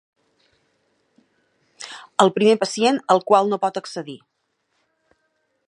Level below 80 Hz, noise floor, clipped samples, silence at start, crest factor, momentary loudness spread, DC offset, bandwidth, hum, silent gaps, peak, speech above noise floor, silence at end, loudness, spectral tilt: -74 dBFS; -72 dBFS; under 0.1%; 1.8 s; 22 dB; 21 LU; under 0.1%; 11.5 kHz; none; none; 0 dBFS; 53 dB; 1.5 s; -19 LUFS; -4.5 dB/octave